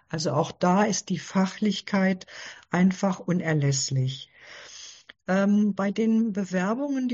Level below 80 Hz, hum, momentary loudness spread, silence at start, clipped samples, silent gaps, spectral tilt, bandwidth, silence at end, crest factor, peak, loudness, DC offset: -66 dBFS; none; 18 LU; 0.1 s; under 0.1%; none; -5.5 dB/octave; 8 kHz; 0 s; 18 dB; -8 dBFS; -25 LUFS; under 0.1%